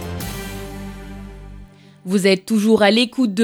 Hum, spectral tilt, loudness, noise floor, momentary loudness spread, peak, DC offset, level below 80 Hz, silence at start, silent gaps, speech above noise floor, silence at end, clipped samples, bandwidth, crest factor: none; -5 dB/octave; -17 LUFS; -41 dBFS; 23 LU; -2 dBFS; under 0.1%; -40 dBFS; 0 s; none; 26 dB; 0 s; under 0.1%; 17.5 kHz; 18 dB